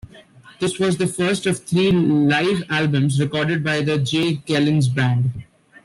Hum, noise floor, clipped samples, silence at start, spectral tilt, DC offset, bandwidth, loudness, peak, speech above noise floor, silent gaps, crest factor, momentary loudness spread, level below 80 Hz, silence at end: none; -46 dBFS; under 0.1%; 0.15 s; -6 dB/octave; under 0.1%; 12.5 kHz; -19 LUFS; -6 dBFS; 27 dB; none; 12 dB; 5 LU; -52 dBFS; 0.4 s